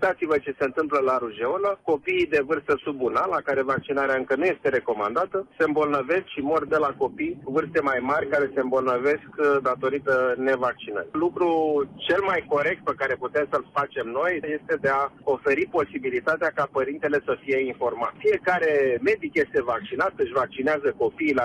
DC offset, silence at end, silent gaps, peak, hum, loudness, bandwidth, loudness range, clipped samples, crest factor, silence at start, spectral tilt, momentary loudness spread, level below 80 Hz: under 0.1%; 0 s; none; -12 dBFS; none; -24 LUFS; 10 kHz; 1 LU; under 0.1%; 12 dB; 0 s; -6.5 dB/octave; 4 LU; -60 dBFS